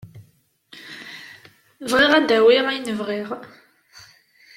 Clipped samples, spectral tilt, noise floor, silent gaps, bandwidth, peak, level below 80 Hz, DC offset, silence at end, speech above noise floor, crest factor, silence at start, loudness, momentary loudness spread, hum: under 0.1%; -3.5 dB/octave; -59 dBFS; none; 15.5 kHz; -2 dBFS; -62 dBFS; under 0.1%; 1.1 s; 41 dB; 20 dB; 0.05 s; -18 LUFS; 23 LU; none